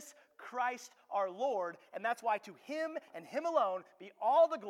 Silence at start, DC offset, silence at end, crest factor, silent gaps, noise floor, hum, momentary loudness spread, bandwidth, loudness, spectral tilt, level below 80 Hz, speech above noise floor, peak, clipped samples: 0 s; under 0.1%; 0 s; 18 dB; none; -54 dBFS; none; 14 LU; 14 kHz; -36 LUFS; -3.5 dB/octave; under -90 dBFS; 19 dB; -18 dBFS; under 0.1%